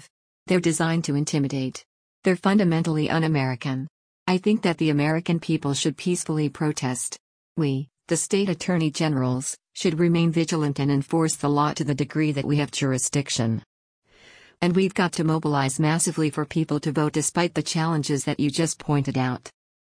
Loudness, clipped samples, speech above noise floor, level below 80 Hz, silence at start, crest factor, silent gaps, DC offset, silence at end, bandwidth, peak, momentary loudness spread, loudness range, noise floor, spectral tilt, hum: -24 LUFS; under 0.1%; 29 dB; -60 dBFS; 0.45 s; 14 dB; 1.86-2.22 s, 3.90-4.26 s, 7.20-7.56 s, 13.66-14.02 s; under 0.1%; 0.4 s; 10.5 kHz; -10 dBFS; 6 LU; 2 LU; -52 dBFS; -5 dB/octave; none